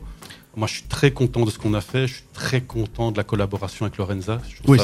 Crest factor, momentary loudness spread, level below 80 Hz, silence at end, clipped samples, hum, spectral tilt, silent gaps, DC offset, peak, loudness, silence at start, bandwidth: 22 dB; 9 LU; -40 dBFS; 0 s; under 0.1%; none; -6 dB/octave; none; under 0.1%; 0 dBFS; -23 LUFS; 0 s; 13.5 kHz